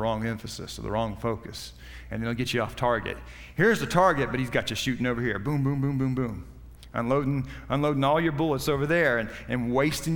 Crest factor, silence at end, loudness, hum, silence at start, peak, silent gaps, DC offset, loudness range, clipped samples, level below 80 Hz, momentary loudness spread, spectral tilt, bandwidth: 20 dB; 0 s; -27 LUFS; none; 0 s; -6 dBFS; none; under 0.1%; 3 LU; under 0.1%; -46 dBFS; 13 LU; -6 dB/octave; 18 kHz